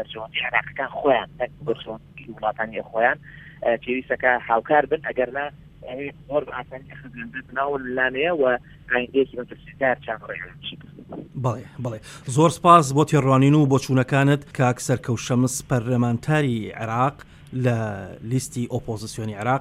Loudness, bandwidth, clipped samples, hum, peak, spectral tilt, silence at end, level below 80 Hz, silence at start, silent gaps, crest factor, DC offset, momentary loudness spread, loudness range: -22 LUFS; 14.5 kHz; under 0.1%; none; 0 dBFS; -6 dB/octave; 0 s; -52 dBFS; 0 s; none; 22 dB; under 0.1%; 16 LU; 8 LU